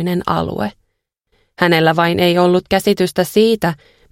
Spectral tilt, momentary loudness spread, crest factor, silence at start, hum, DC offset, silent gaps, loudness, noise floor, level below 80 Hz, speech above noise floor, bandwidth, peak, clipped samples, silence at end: -5.5 dB/octave; 9 LU; 16 dB; 0 s; none; under 0.1%; none; -15 LUFS; -70 dBFS; -46 dBFS; 55 dB; 16.5 kHz; 0 dBFS; under 0.1%; 0.35 s